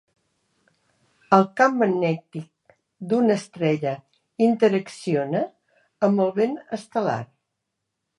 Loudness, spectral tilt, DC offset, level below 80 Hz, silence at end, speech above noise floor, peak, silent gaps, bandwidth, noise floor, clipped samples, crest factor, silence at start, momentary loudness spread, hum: -23 LUFS; -7 dB/octave; under 0.1%; -74 dBFS; 0.95 s; 59 dB; -2 dBFS; none; 11 kHz; -80 dBFS; under 0.1%; 22 dB; 1.3 s; 14 LU; none